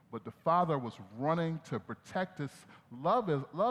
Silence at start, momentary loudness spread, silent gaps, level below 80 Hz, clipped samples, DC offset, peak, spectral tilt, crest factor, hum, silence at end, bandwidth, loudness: 0.1 s; 13 LU; none; -76 dBFS; under 0.1%; under 0.1%; -16 dBFS; -7.5 dB/octave; 18 dB; none; 0 s; 12 kHz; -34 LUFS